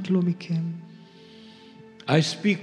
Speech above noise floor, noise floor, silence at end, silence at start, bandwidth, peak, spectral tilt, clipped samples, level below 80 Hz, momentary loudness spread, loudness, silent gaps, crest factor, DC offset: 24 dB; -48 dBFS; 0 s; 0 s; 10.5 kHz; -6 dBFS; -6 dB/octave; under 0.1%; -80 dBFS; 25 LU; -25 LUFS; none; 22 dB; under 0.1%